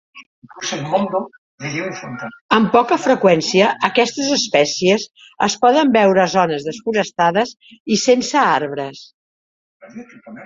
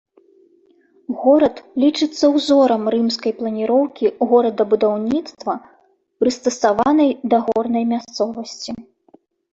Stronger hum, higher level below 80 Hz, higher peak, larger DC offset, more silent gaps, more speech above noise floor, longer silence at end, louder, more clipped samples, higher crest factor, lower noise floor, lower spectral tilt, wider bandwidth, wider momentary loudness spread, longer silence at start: neither; about the same, -60 dBFS vs -60 dBFS; first, 0 dBFS vs -4 dBFS; neither; first, 0.26-0.42 s, 1.38-1.58 s, 2.41-2.49 s, 7.80-7.85 s, 9.14-9.80 s vs none; first, over 73 dB vs 38 dB; second, 0 s vs 0.7 s; about the same, -16 LUFS vs -18 LUFS; neither; about the same, 16 dB vs 16 dB; first, under -90 dBFS vs -55 dBFS; about the same, -4 dB/octave vs -5 dB/octave; about the same, 7.8 kHz vs 8.2 kHz; first, 15 LU vs 12 LU; second, 0.15 s vs 1.1 s